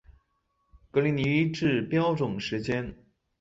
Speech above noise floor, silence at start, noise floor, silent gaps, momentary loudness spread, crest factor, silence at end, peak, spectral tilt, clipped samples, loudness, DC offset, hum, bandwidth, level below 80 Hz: 48 dB; 0.1 s; -74 dBFS; none; 6 LU; 16 dB; 0.45 s; -12 dBFS; -7 dB/octave; under 0.1%; -27 LUFS; under 0.1%; none; 7.8 kHz; -56 dBFS